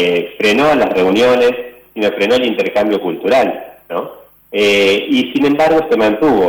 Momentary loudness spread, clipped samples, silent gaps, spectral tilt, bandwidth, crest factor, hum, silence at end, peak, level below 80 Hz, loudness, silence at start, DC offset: 12 LU; under 0.1%; none; -4.5 dB/octave; over 20 kHz; 8 dB; none; 0 s; -6 dBFS; -48 dBFS; -13 LUFS; 0 s; under 0.1%